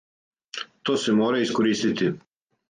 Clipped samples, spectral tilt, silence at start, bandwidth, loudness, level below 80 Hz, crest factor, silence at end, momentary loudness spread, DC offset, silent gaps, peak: under 0.1%; -5 dB/octave; 0.55 s; 9.6 kHz; -23 LUFS; -66 dBFS; 14 dB; 0.5 s; 14 LU; under 0.1%; none; -10 dBFS